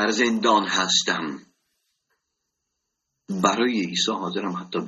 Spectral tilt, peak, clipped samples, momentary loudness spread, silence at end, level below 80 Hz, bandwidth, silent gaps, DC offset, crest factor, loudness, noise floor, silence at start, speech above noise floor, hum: -3 dB/octave; -4 dBFS; under 0.1%; 10 LU; 0 s; -68 dBFS; 12 kHz; none; under 0.1%; 20 dB; -22 LUFS; -80 dBFS; 0 s; 57 dB; none